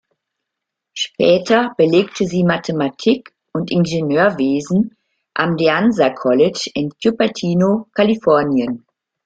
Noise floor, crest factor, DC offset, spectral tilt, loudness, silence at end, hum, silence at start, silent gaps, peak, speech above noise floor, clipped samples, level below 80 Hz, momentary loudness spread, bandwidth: -81 dBFS; 16 dB; under 0.1%; -6 dB/octave; -16 LUFS; 0.5 s; none; 0.95 s; none; -2 dBFS; 65 dB; under 0.1%; -56 dBFS; 10 LU; 9 kHz